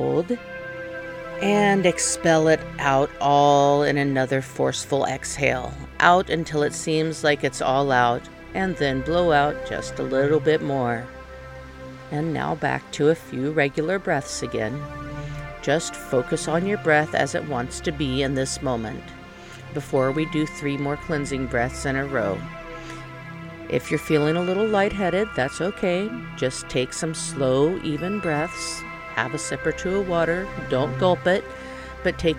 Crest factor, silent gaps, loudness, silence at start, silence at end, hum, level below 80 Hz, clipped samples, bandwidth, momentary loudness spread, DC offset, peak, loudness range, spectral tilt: 22 dB; none; -23 LUFS; 0 s; 0 s; none; -44 dBFS; under 0.1%; 17 kHz; 15 LU; under 0.1%; 0 dBFS; 6 LU; -5 dB/octave